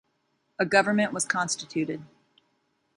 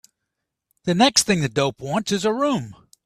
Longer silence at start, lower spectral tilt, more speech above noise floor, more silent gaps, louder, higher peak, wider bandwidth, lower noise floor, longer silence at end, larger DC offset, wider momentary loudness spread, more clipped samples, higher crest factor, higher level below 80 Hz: second, 0.6 s vs 0.85 s; about the same, -3.5 dB/octave vs -3.5 dB/octave; second, 47 dB vs 60 dB; neither; second, -26 LUFS vs -20 LUFS; second, -6 dBFS vs -2 dBFS; second, 11.5 kHz vs 15 kHz; second, -73 dBFS vs -81 dBFS; first, 0.9 s vs 0.35 s; neither; about the same, 13 LU vs 11 LU; neither; about the same, 22 dB vs 22 dB; second, -72 dBFS vs -56 dBFS